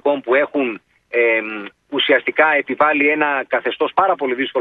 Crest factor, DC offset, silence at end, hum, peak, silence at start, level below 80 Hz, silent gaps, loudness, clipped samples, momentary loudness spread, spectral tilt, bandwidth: 18 dB; under 0.1%; 0 s; none; 0 dBFS; 0.05 s; -66 dBFS; none; -17 LUFS; under 0.1%; 9 LU; -6.5 dB/octave; 4.7 kHz